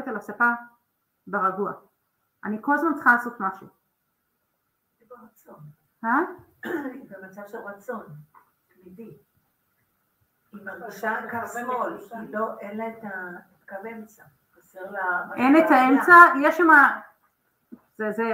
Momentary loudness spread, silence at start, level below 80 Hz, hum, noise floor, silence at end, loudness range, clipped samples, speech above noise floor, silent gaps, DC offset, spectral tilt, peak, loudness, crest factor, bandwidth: 24 LU; 0 s; -74 dBFS; none; -75 dBFS; 0 s; 21 LU; under 0.1%; 52 dB; none; under 0.1%; -5.5 dB/octave; 0 dBFS; -21 LUFS; 24 dB; 16 kHz